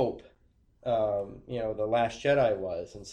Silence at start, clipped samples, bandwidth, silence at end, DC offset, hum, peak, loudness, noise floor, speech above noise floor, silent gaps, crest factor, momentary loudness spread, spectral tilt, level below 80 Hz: 0 s; under 0.1%; 9.4 kHz; 0 s; under 0.1%; none; -14 dBFS; -30 LUFS; -65 dBFS; 36 dB; none; 16 dB; 12 LU; -6 dB/octave; -56 dBFS